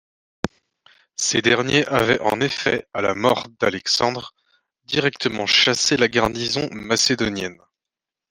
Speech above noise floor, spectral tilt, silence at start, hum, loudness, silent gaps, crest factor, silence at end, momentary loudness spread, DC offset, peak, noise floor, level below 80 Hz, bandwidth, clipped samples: 67 dB; -3 dB/octave; 0.45 s; none; -19 LUFS; none; 20 dB; 0.75 s; 14 LU; under 0.1%; -2 dBFS; -87 dBFS; -52 dBFS; 16 kHz; under 0.1%